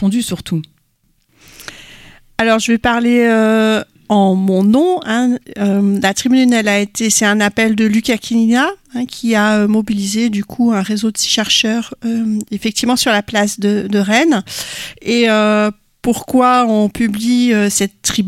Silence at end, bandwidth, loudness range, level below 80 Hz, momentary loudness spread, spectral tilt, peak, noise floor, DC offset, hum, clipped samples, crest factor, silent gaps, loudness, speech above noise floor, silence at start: 0 s; 16 kHz; 2 LU; -48 dBFS; 8 LU; -4 dB/octave; 0 dBFS; -59 dBFS; under 0.1%; none; under 0.1%; 14 dB; none; -14 LUFS; 46 dB; 0 s